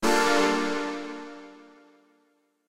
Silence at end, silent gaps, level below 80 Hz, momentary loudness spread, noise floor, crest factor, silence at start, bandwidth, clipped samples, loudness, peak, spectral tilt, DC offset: 0 s; none; -58 dBFS; 21 LU; -69 dBFS; 18 dB; 0 s; 16 kHz; under 0.1%; -25 LUFS; -10 dBFS; -3 dB/octave; under 0.1%